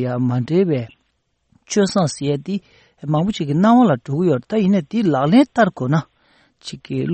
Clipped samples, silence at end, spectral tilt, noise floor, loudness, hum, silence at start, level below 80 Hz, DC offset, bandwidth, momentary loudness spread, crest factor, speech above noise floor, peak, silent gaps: under 0.1%; 0 s; -6.5 dB/octave; -68 dBFS; -18 LUFS; none; 0 s; -56 dBFS; under 0.1%; 8.8 kHz; 13 LU; 16 dB; 51 dB; -2 dBFS; none